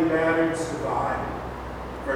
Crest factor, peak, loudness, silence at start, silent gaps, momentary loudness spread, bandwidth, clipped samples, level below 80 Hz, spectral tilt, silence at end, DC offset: 14 dB; -10 dBFS; -26 LUFS; 0 s; none; 13 LU; 14 kHz; under 0.1%; -42 dBFS; -6 dB/octave; 0 s; under 0.1%